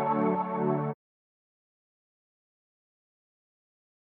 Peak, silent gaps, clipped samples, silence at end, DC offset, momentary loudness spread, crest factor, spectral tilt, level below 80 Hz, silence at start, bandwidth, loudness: -14 dBFS; none; under 0.1%; 3.15 s; under 0.1%; 10 LU; 20 dB; -11.5 dB/octave; -80 dBFS; 0 s; 4.2 kHz; -29 LUFS